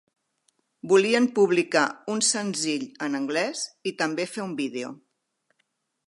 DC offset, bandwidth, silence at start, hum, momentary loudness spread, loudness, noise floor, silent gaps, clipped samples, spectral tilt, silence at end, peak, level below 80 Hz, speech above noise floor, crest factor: under 0.1%; 11.5 kHz; 0.85 s; none; 10 LU; -25 LUFS; -75 dBFS; none; under 0.1%; -3 dB/octave; 1.1 s; -6 dBFS; -80 dBFS; 50 dB; 20 dB